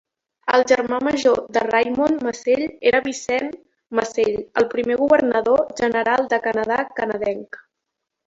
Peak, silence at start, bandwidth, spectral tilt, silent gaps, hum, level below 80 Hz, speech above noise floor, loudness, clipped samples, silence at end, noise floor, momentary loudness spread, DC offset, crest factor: -2 dBFS; 0.45 s; 7.8 kHz; -4 dB/octave; none; none; -56 dBFS; 61 dB; -20 LUFS; under 0.1%; 0.7 s; -80 dBFS; 8 LU; under 0.1%; 18 dB